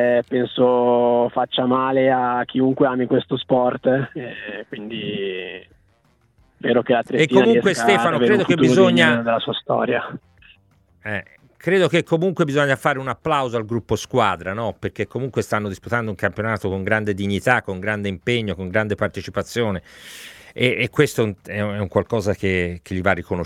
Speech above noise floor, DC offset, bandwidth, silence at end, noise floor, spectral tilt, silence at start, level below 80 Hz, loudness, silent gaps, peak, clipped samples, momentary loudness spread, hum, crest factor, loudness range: 41 dB; under 0.1%; 15 kHz; 0 s; -60 dBFS; -6 dB/octave; 0 s; -52 dBFS; -20 LUFS; none; 0 dBFS; under 0.1%; 12 LU; none; 20 dB; 7 LU